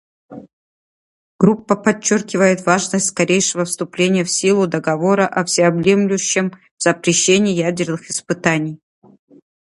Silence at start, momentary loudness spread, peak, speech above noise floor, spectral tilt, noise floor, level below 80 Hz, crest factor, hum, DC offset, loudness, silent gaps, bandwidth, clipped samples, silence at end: 0.3 s; 7 LU; 0 dBFS; over 74 dB; -4 dB/octave; under -90 dBFS; -58 dBFS; 18 dB; none; under 0.1%; -16 LUFS; 0.53-1.39 s, 6.71-6.77 s; 11.5 kHz; under 0.1%; 1 s